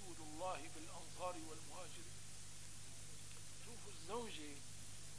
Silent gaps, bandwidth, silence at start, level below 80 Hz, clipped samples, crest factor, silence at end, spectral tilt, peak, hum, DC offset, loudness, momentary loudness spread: none; 11 kHz; 0 s; -68 dBFS; under 0.1%; 20 dB; 0 s; -3 dB/octave; -32 dBFS; 50 Hz at -65 dBFS; 0.3%; -52 LUFS; 7 LU